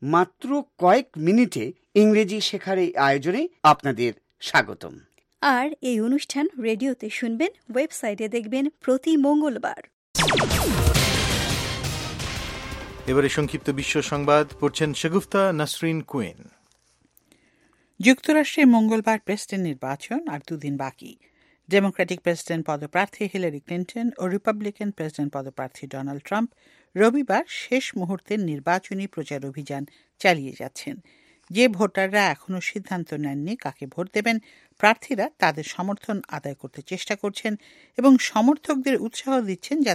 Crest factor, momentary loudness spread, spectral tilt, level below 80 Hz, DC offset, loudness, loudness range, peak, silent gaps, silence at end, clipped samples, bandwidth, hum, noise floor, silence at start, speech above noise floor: 24 dB; 13 LU; -5 dB/octave; -42 dBFS; under 0.1%; -23 LUFS; 5 LU; 0 dBFS; 9.93-10.14 s; 0 s; under 0.1%; 16 kHz; none; -64 dBFS; 0 s; 41 dB